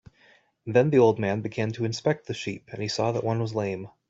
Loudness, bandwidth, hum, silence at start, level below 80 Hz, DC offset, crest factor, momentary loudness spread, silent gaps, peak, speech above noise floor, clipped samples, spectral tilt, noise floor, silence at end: -26 LUFS; 8 kHz; none; 0.65 s; -64 dBFS; under 0.1%; 20 dB; 13 LU; none; -6 dBFS; 35 dB; under 0.1%; -6.5 dB/octave; -60 dBFS; 0.2 s